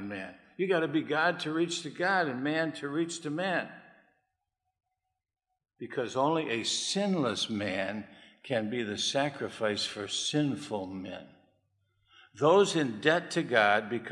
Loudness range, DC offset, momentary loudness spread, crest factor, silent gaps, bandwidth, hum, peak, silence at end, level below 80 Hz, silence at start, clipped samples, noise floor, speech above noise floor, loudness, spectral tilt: 6 LU; under 0.1%; 14 LU; 24 dB; none; 12 kHz; none; -8 dBFS; 0 s; -78 dBFS; 0 s; under 0.1%; -85 dBFS; 55 dB; -30 LUFS; -4 dB/octave